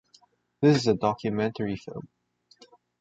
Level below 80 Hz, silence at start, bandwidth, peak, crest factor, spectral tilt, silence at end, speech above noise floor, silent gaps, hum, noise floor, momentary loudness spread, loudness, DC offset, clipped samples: -60 dBFS; 0.6 s; 8 kHz; -8 dBFS; 20 dB; -6.5 dB/octave; 0.95 s; 37 dB; none; 60 Hz at -55 dBFS; -62 dBFS; 16 LU; -26 LUFS; under 0.1%; under 0.1%